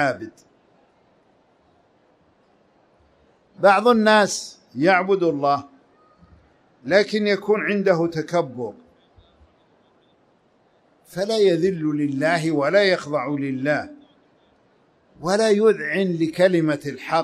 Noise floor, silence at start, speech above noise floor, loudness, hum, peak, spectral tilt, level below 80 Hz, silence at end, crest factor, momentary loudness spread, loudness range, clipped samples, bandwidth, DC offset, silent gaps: -60 dBFS; 0 s; 41 dB; -20 LUFS; none; -2 dBFS; -5 dB/octave; -64 dBFS; 0 s; 20 dB; 13 LU; 7 LU; under 0.1%; 13.5 kHz; under 0.1%; none